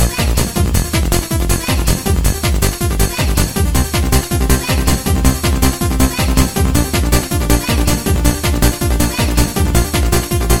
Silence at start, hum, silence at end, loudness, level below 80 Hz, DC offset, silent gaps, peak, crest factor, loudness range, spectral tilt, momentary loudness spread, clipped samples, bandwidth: 0 s; none; 0 s; -15 LUFS; -18 dBFS; 2%; none; 0 dBFS; 14 dB; 1 LU; -4.5 dB/octave; 2 LU; under 0.1%; 19 kHz